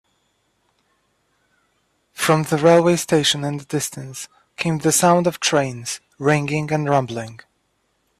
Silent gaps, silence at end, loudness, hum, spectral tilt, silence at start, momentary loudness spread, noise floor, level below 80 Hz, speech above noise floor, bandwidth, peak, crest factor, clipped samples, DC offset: none; 0.85 s; -19 LUFS; none; -4.5 dB/octave; 2.15 s; 16 LU; -68 dBFS; -60 dBFS; 49 dB; 15.5 kHz; -2 dBFS; 18 dB; under 0.1%; under 0.1%